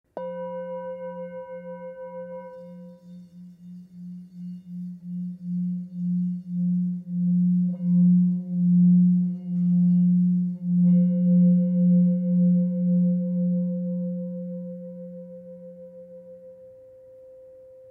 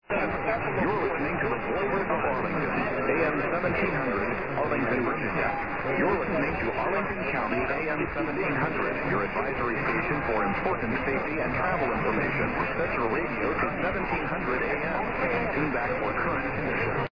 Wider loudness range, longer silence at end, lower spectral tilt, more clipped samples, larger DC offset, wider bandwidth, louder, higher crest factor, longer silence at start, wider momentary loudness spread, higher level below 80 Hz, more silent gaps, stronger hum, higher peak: first, 19 LU vs 1 LU; first, 0.3 s vs 0 s; first, -13.5 dB/octave vs -8.5 dB/octave; neither; second, under 0.1% vs 0.6%; second, 1.6 kHz vs 5.2 kHz; first, -23 LUFS vs -27 LUFS; about the same, 12 dB vs 14 dB; first, 0.15 s vs 0 s; first, 23 LU vs 2 LU; second, -76 dBFS vs -46 dBFS; neither; neither; about the same, -12 dBFS vs -12 dBFS